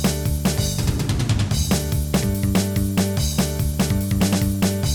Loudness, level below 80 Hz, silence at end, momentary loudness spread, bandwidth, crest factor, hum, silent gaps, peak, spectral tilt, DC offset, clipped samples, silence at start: -21 LUFS; -28 dBFS; 0 s; 2 LU; over 20 kHz; 14 dB; none; none; -6 dBFS; -5 dB/octave; under 0.1%; under 0.1%; 0 s